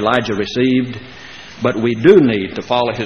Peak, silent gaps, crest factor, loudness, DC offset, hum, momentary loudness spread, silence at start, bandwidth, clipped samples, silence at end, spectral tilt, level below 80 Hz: 0 dBFS; none; 16 dB; -15 LUFS; 0.4%; none; 22 LU; 0 s; 6.6 kHz; under 0.1%; 0 s; -6.5 dB/octave; -48 dBFS